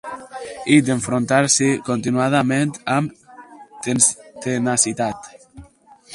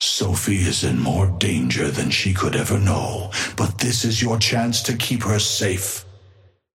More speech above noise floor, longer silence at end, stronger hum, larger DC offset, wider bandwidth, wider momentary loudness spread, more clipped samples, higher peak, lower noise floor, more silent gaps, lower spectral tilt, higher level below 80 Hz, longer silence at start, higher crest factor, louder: about the same, 30 dB vs 32 dB; second, 0 s vs 0.6 s; neither; neither; second, 11.5 kHz vs 16.5 kHz; first, 14 LU vs 6 LU; neither; first, 0 dBFS vs -4 dBFS; second, -48 dBFS vs -52 dBFS; neither; about the same, -4 dB/octave vs -4 dB/octave; second, -56 dBFS vs -44 dBFS; about the same, 0.05 s vs 0 s; about the same, 20 dB vs 18 dB; about the same, -18 LUFS vs -20 LUFS